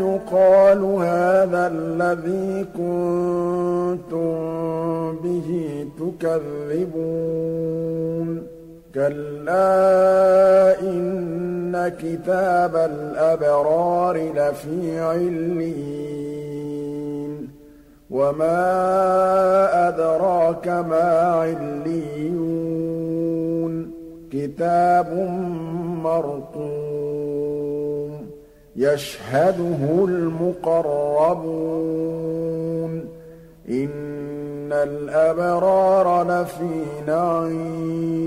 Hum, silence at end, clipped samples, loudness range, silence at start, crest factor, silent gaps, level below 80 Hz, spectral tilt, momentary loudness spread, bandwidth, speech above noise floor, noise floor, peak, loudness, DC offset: none; 0 s; under 0.1%; 7 LU; 0 s; 14 dB; none; -54 dBFS; -7.5 dB/octave; 13 LU; 15 kHz; 27 dB; -47 dBFS; -6 dBFS; -21 LUFS; under 0.1%